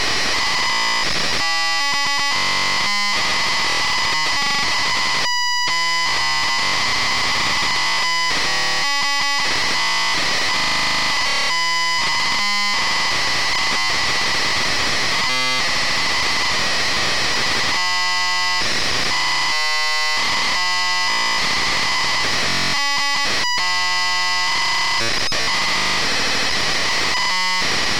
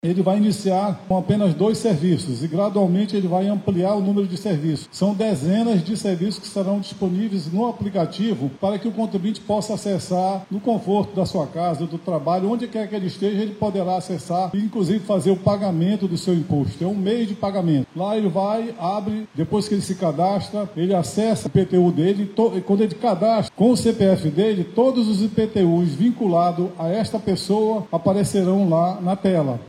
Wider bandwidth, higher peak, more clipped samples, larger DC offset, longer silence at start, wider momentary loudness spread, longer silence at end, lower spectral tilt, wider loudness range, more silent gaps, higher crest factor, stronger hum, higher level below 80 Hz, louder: first, 16.5 kHz vs 13 kHz; second, -10 dBFS vs -4 dBFS; neither; first, 6% vs under 0.1%; about the same, 0 s vs 0.05 s; second, 0 LU vs 6 LU; about the same, 0 s vs 0 s; second, -0.5 dB/octave vs -7 dB/octave; second, 0 LU vs 4 LU; neither; second, 10 dB vs 16 dB; neither; first, -44 dBFS vs -56 dBFS; first, -17 LUFS vs -21 LUFS